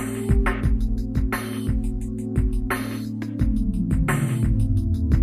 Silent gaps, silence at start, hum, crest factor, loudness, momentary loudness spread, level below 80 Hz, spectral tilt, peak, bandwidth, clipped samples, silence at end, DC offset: none; 0 s; none; 16 dB; -24 LUFS; 5 LU; -26 dBFS; -7 dB/octave; -6 dBFS; 14 kHz; under 0.1%; 0 s; under 0.1%